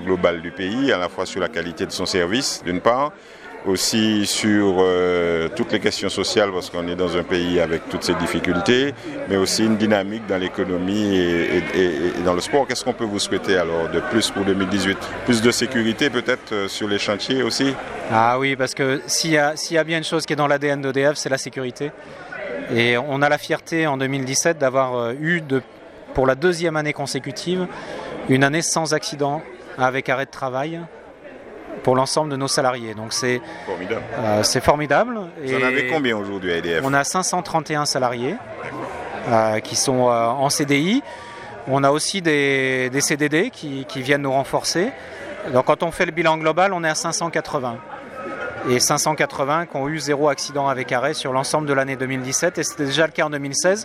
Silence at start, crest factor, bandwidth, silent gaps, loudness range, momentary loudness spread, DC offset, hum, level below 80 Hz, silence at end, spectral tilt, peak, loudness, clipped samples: 0 s; 20 dB; 15.5 kHz; none; 3 LU; 10 LU; under 0.1%; none; -52 dBFS; 0 s; -4 dB/octave; 0 dBFS; -20 LUFS; under 0.1%